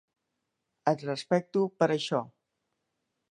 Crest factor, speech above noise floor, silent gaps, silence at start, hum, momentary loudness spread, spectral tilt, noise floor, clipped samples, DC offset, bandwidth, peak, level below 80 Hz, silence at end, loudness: 22 dB; 54 dB; none; 0.85 s; none; 6 LU; -6 dB/octave; -83 dBFS; under 0.1%; under 0.1%; 11 kHz; -10 dBFS; -78 dBFS; 1.05 s; -29 LUFS